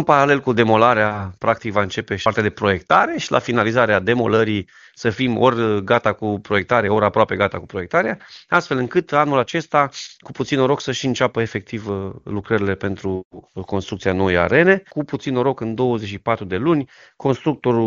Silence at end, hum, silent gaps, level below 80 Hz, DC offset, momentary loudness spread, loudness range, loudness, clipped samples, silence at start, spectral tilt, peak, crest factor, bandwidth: 0 s; none; 13.25-13.31 s; -52 dBFS; under 0.1%; 11 LU; 4 LU; -19 LUFS; under 0.1%; 0 s; -4.5 dB/octave; 0 dBFS; 18 dB; 7.6 kHz